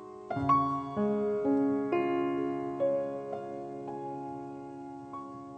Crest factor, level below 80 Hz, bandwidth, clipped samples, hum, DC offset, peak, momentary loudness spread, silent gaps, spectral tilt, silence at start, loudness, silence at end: 18 dB; -64 dBFS; 8.4 kHz; under 0.1%; none; under 0.1%; -14 dBFS; 15 LU; none; -8.5 dB/octave; 0 s; -32 LUFS; 0 s